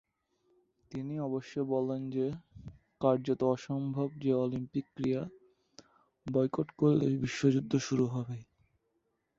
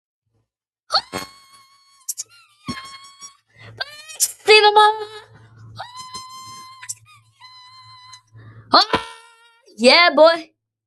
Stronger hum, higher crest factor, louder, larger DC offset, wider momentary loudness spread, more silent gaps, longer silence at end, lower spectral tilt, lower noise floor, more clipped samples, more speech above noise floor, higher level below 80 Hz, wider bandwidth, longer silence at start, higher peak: neither; about the same, 20 dB vs 20 dB; second, -33 LUFS vs -15 LUFS; neither; second, 16 LU vs 26 LU; neither; first, 0.95 s vs 0.45 s; first, -7.5 dB/octave vs -1.5 dB/octave; about the same, -79 dBFS vs -76 dBFS; neither; second, 48 dB vs 62 dB; about the same, -66 dBFS vs -62 dBFS; second, 7.8 kHz vs 12.5 kHz; about the same, 0.9 s vs 0.9 s; second, -14 dBFS vs 0 dBFS